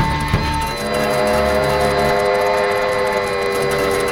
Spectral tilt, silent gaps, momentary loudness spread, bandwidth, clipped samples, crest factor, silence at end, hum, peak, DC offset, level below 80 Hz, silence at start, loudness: -4.5 dB/octave; none; 3 LU; 18.5 kHz; under 0.1%; 14 dB; 0 s; none; -4 dBFS; under 0.1%; -32 dBFS; 0 s; -17 LUFS